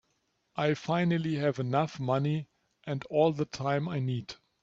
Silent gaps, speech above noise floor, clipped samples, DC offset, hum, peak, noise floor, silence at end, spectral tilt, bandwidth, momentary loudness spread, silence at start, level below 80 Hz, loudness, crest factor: none; 47 dB; under 0.1%; under 0.1%; none; -14 dBFS; -76 dBFS; 0.3 s; -7 dB/octave; 7.8 kHz; 11 LU; 0.55 s; -68 dBFS; -30 LUFS; 18 dB